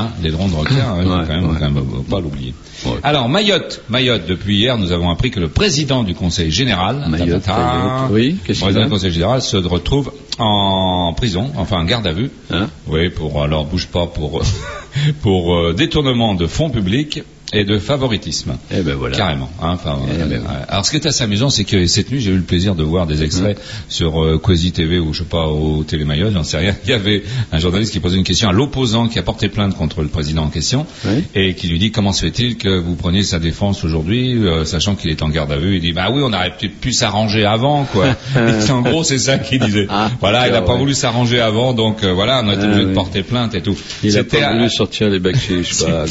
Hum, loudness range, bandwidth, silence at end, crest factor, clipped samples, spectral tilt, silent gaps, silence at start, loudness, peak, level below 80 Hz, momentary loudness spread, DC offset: none; 3 LU; 8 kHz; 0 s; 14 dB; under 0.1%; -5 dB/octave; none; 0 s; -16 LUFS; 0 dBFS; -30 dBFS; 6 LU; under 0.1%